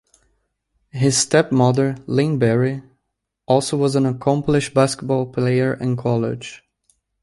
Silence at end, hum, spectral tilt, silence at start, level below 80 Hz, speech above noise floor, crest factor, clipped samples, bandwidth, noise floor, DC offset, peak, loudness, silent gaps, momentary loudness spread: 0.65 s; none; -5.5 dB/octave; 0.95 s; -54 dBFS; 58 dB; 18 dB; under 0.1%; 11.5 kHz; -76 dBFS; under 0.1%; -2 dBFS; -19 LUFS; none; 7 LU